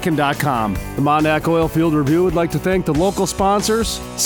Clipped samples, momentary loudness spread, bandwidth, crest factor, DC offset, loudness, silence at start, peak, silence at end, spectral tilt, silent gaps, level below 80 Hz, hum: under 0.1%; 4 LU; over 20 kHz; 14 dB; under 0.1%; -17 LUFS; 0 s; -2 dBFS; 0 s; -5 dB/octave; none; -34 dBFS; none